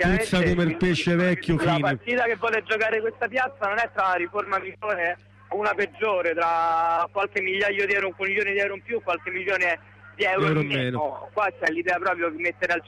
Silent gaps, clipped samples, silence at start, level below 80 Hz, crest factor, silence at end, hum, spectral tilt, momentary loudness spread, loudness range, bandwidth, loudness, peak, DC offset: none; under 0.1%; 0 s; -46 dBFS; 12 dB; 0.05 s; none; -6 dB/octave; 5 LU; 2 LU; 13 kHz; -24 LUFS; -12 dBFS; under 0.1%